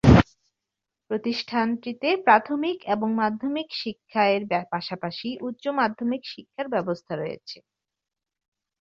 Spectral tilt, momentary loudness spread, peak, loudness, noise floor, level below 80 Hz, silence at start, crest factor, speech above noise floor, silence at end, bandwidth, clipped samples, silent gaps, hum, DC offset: -7.5 dB/octave; 13 LU; -2 dBFS; -25 LUFS; -87 dBFS; -40 dBFS; 0.05 s; 22 dB; 62 dB; 1.25 s; 7.6 kHz; under 0.1%; none; none; under 0.1%